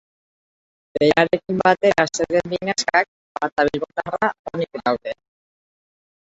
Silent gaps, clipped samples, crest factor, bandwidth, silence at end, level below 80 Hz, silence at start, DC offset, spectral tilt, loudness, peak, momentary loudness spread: 3.08-3.35 s, 3.52-3.56 s, 4.39-4.44 s; under 0.1%; 20 dB; 8 kHz; 1.15 s; -54 dBFS; 0.95 s; under 0.1%; -4 dB/octave; -20 LUFS; -2 dBFS; 11 LU